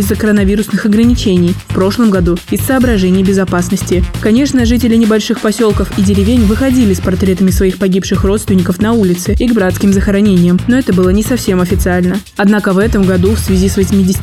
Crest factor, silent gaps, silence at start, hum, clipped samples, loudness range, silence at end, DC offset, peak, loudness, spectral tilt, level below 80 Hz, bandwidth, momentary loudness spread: 10 dB; none; 0 s; none; under 0.1%; 1 LU; 0 s; 0.2%; 0 dBFS; -11 LUFS; -6 dB/octave; -22 dBFS; 16 kHz; 3 LU